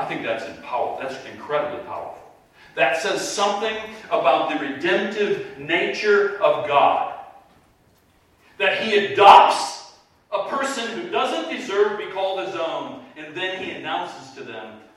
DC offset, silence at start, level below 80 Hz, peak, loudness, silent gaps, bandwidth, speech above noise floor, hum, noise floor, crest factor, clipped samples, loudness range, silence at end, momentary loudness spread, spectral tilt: under 0.1%; 0 s; -66 dBFS; 0 dBFS; -21 LUFS; none; 13.5 kHz; 37 dB; none; -58 dBFS; 22 dB; under 0.1%; 8 LU; 0.2 s; 16 LU; -3 dB/octave